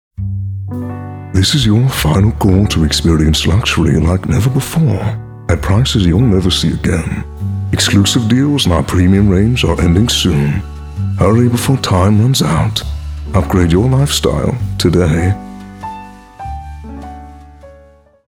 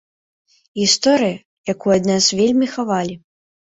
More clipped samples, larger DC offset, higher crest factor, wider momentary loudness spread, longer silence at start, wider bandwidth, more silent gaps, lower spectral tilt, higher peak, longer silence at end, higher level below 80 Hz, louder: first, 0.2% vs under 0.1%; neither; second, 12 dB vs 18 dB; first, 16 LU vs 13 LU; second, 0.2 s vs 0.75 s; first, 17 kHz vs 8 kHz; second, none vs 1.45-1.64 s; first, -5.5 dB/octave vs -3.5 dB/octave; about the same, 0 dBFS vs -2 dBFS; about the same, 0.6 s vs 0.6 s; first, -26 dBFS vs -56 dBFS; first, -13 LUFS vs -17 LUFS